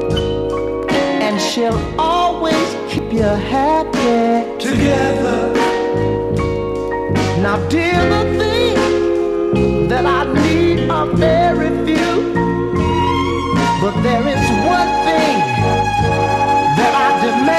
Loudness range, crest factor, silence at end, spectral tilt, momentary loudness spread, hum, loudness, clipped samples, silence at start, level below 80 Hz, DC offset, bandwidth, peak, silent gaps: 2 LU; 14 dB; 0 s; -6 dB/octave; 4 LU; none; -15 LUFS; under 0.1%; 0 s; -32 dBFS; under 0.1%; 14.5 kHz; -2 dBFS; none